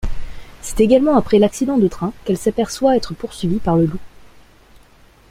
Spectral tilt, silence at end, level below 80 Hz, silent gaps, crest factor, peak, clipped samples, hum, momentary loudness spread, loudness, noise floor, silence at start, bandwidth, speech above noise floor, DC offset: -6.5 dB/octave; 1.05 s; -34 dBFS; none; 16 dB; -2 dBFS; under 0.1%; none; 15 LU; -17 LUFS; -48 dBFS; 0 s; 16 kHz; 32 dB; under 0.1%